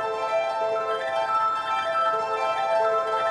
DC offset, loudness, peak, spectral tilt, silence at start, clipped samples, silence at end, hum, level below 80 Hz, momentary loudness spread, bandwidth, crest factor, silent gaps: under 0.1%; -24 LUFS; -12 dBFS; -2.5 dB/octave; 0 s; under 0.1%; 0 s; none; -68 dBFS; 3 LU; 11 kHz; 12 dB; none